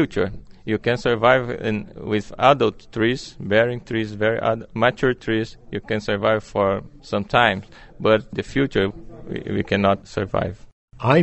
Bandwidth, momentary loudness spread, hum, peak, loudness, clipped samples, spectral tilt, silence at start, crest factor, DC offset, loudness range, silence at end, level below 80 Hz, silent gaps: 8.2 kHz; 11 LU; none; -2 dBFS; -21 LUFS; under 0.1%; -6.5 dB/octave; 0 s; 20 dB; under 0.1%; 2 LU; 0 s; -46 dBFS; 10.73-10.88 s